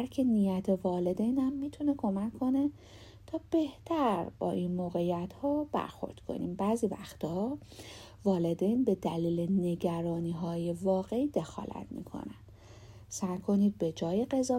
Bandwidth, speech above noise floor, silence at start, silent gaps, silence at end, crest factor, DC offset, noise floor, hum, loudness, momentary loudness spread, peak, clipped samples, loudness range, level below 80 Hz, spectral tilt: 15.5 kHz; 21 dB; 0 s; none; 0 s; 16 dB; under 0.1%; -52 dBFS; none; -32 LUFS; 13 LU; -16 dBFS; under 0.1%; 3 LU; -58 dBFS; -7.5 dB/octave